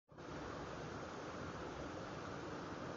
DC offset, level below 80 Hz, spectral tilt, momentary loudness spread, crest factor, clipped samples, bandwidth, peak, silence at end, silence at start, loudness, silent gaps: under 0.1%; -64 dBFS; -4.5 dB/octave; 1 LU; 12 dB; under 0.1%; 7.6 kHz; -36 dBFS; 0 s; 0.1 s; -48 LUFS; none